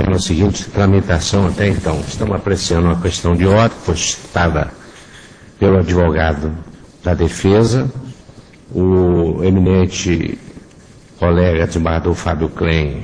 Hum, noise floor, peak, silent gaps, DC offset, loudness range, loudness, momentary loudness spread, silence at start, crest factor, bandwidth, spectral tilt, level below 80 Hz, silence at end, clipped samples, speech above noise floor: none; -42 dBFS; 0 dBFS; none; under 0.1%; 2 LU; -15 LUFS; 8 LU; 0 s; 16 dB; 10.5 kHz; -6 dB/octave; -28 dBFS; 0 s; under 0.1%; 27 dB